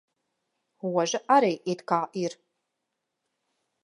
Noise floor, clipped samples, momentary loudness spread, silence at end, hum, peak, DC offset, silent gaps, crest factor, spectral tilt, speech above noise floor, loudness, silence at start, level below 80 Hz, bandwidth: -82 dBFS; under 0.1%; 11 LU; 1.5 s; none; -8 dBFS; under 0.1%; none; 22 dB; -4.5 dB/octave; 57 dB; -26 LUFS; 0.85 s; -84 dBFS; 11 kHz